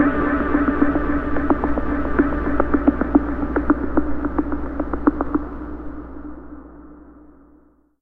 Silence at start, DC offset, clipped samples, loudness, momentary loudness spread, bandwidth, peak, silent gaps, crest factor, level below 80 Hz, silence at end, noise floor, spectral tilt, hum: 0 s; under 0.1%; under 0.1%; -21 LUFS; 17 LU; 3.9 kHz; 0 dBFS; none; 20 dB; -30 dBFS; 0.9 s; -54 dBFS; -10.5 dB/octave; none